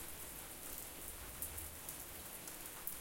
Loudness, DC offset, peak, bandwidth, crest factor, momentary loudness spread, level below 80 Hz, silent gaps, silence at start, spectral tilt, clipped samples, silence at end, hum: -47 LUFS; under 0.1%; -18 dBFS; 17 kHz; 30 dB; 3 LU; -60 dBFS; none; 0 s; -2 dB/octave; under 0.1%; 0 s; none